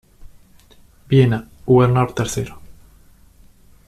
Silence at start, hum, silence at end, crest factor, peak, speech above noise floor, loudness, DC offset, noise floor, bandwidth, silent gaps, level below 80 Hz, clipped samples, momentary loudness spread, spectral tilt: 0.2 s; none; 1.15 s; 18 dB; -2 dBFS; 33 dB; -17 LUFS; under 0.1%; -49 dBFS; 13.5 kHz; none; -44 dBFS; under 0.1%; 12 LU; -7 dB/octave